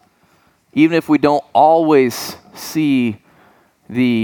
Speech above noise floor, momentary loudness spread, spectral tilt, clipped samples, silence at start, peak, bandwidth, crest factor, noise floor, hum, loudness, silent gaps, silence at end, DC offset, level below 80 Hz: 42 dB; 14 LU; -6 dB/octave; under 0.1%; 0.75 s; 0 dBFS; 20 kHz; 16 dB; -56 dBFS; none; -15 LUFS; none; 0 s; under 0.1%; -60 dBFS